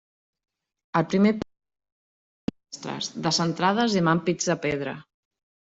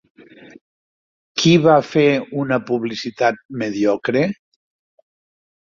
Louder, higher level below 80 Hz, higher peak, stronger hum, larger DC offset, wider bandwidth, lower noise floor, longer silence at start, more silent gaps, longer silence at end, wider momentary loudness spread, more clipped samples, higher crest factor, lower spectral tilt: second, -25 LUFS vs -18 LUFS; about the same, -60 dBFS vs -58 dBFS; second, -8 dBFS vs -2 dBFS; neither; neither; about the same, 8 kHz vs 7.4 kHz; about the same, under -90 dBFS vs under -90 dBFS; second, 0.95 s vs 1.35 s; first, 1.92-2.48 s vs 3.45-3.49 s; second, 0.7 s vs 1.35 s; about the same, 14 LU vs 12 LU; neither; about the same, 20 dB vs 18 dB; about the same, -4.5 dB/octave vs -5.5 dB/octave